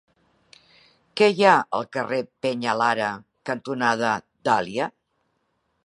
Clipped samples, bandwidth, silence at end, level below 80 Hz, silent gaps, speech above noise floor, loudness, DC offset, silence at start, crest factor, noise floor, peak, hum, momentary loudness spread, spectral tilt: under 0.1%; 11 kHz; 0.95 s; -70 dBFS; none; 50 dB; -23 LUFS; under 0.1%; 1.15 s; 22 dB; -72 dBFS; -2 dBFS; none; 13 LU; -4.5 dB/octave